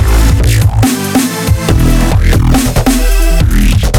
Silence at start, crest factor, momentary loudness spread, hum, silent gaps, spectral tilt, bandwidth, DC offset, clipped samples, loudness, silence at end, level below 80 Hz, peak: 0 s; 8 dB; 3 LU; none; none; -5.5 dB/octave; 17.5 kHz; under 0.1%; under 0.1%; -10 LUFS; 0 s; -10 dBFS; 0 dBFS